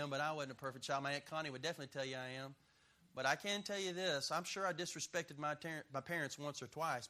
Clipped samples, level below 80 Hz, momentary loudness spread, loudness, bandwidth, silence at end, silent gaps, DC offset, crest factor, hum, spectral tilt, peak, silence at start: under 0.1%; -82 dBFS; 7 LU; -42 LUFS; 15 kHz; 0 s; none; under 0.1%; 24 dB; none; -3 dB/octave; -20 dBFS; 0 s